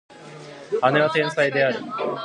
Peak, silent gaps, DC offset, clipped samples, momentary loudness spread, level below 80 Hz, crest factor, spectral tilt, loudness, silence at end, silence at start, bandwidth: -2 dBFS; none; under 0.1%; under 0.1%; 21 LU; -72 dBFS; 20 dB; -5.5 dB/octave; -21 LUFS; 0 s; 0.1 s; 11 kHz